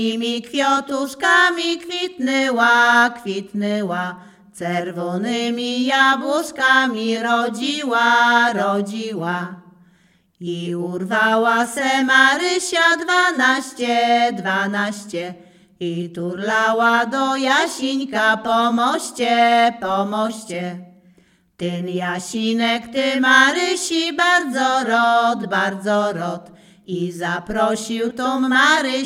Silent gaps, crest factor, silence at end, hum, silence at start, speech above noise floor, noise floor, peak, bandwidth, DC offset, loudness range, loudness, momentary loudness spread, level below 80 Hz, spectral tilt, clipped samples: none; 18 dB; 0 s; none; 0 s; 39 dB; -57 dBFS; 0 dBFS; 16 kHz; under 0.1%; 5 LU; -18 LUFS; 12 LU; -62 dBFS; -3.5 dB/octave; under 0.1%